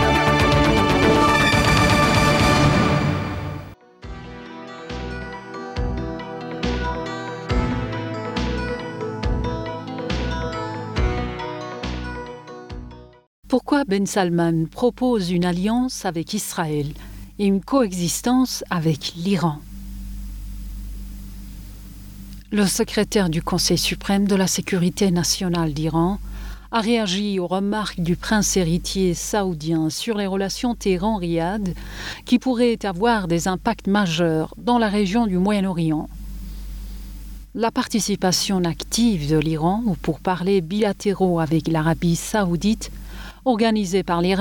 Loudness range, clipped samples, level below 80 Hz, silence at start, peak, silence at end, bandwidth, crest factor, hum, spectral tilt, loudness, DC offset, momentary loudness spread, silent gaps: 8 LU; under 0.1%; -34 dBFS; 0 s; -6 dBFS; 0 s; 19.5 kHz; 16 dB; none; -5 dB/octave; -21 LUFS; under 0.1%; 19 LU; 13.27-13.43 s